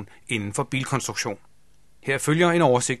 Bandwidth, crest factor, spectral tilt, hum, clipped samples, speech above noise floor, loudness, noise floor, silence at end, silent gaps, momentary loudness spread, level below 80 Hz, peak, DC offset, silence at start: 13 kHz; 18 dB; -4.5 dB/octave; none; under 0.1%; 38 dB; -23 LUFS; -62 dBFS; 0 s; none; 12 LU; -60 dBFS; -6 dBFS; 0.3%; 0 s